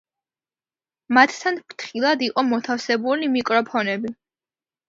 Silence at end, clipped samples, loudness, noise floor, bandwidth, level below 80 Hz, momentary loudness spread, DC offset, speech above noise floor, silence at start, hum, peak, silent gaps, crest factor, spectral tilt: 0.75 s; under 0.1%; -21 LUFS; under -90 dBFS; 7.6 kHz; -72 dBFS; 11 LU; under 0.1%; over 69 dB; 1.1 s; none; 0 dBFS; none; 22 dB; -4 dB/octave